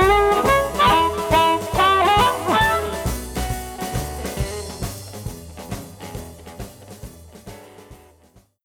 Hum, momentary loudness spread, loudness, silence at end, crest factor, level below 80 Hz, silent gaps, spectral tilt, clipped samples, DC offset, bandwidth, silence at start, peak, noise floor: none; 22 LU; -19 LUFS; 0.7 s; 16 dB; -34 dBFS; none; -4 dB/octave; under 0.1%; under 0.1%; over 20 kHz; 0 s; -6 dBFS; -54 dBFS